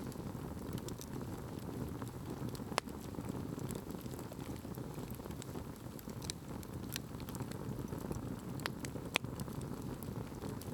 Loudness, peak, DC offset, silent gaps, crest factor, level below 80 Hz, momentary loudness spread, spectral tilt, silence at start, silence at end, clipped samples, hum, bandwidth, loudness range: -44 LUFS; -10 dBFS; under 0.1%; none; 34 dB; -58 dBFS; 6 LU; -5 dB/octave; 0 s; 0 s; under 0.1%; none; over 20 kHz; 3 LU